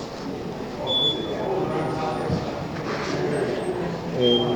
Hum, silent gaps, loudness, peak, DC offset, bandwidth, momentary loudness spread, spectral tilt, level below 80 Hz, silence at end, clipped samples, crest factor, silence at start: none; none; -25 LUFS; -8 dBFS; under 0.1%; 19.5 kHz; 11 LU; -5.5 dB/octave; -48 dBFS; 0 s; under 0.1%; 18 dB; 0 s